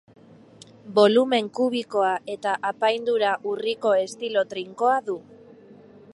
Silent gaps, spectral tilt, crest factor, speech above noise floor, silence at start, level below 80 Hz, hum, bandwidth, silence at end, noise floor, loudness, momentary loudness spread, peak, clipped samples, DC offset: none; -4.5 dB/octave; 20 dB; 27 dB; 0.85 s; -74 dBFS; none; 11.5 kHz; 0.4 s; -49 dBFS; -23 LUFS; 9 LU; -4 dBFS; under 0.1%; under 0.1%